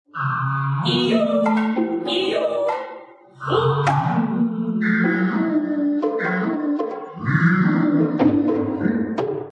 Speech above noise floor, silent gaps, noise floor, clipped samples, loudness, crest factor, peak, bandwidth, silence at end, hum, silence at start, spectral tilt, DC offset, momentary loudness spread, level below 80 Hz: 22 dB; none; -41 dBFS; under 0.1%; -20 LUFS; 16 dB; -4 dBFS; 10 kHz; 0 s; none; 0.15 s; -7.5 dB/octave; under 0.1%; 7 LU; -64 dBFS